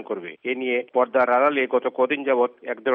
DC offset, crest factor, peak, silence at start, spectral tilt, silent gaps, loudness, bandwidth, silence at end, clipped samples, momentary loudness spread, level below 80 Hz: under 0.1%; 14 dB; -8 dBFS; 0 s; -7 dB/octave; none; -22 LUFS; 4.3 kHz; 0 s; under 0.1%; 10 LU; -78 dBFS